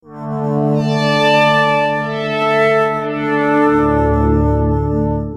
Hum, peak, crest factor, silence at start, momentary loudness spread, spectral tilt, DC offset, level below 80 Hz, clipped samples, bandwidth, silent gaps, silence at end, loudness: 50 Hz at -45 dBFS; -2 dBFS; 14 dB; 0.05 s; 7 LU; -7 dB/octave; under 0.1%; -28 dBFS; under 0.1%; 13 kHz; none; 0 s; -14 LUFS